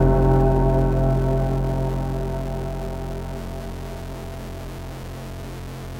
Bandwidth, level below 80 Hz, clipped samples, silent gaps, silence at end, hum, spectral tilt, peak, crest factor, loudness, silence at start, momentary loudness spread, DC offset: 16 kHz; -28 dBFS; under 0.1%; none; 0 s; none; -8.5 dB/octave; -6 dBFS; 16 dB; -24 LUFS; 0 s; 16 LU; 0.2%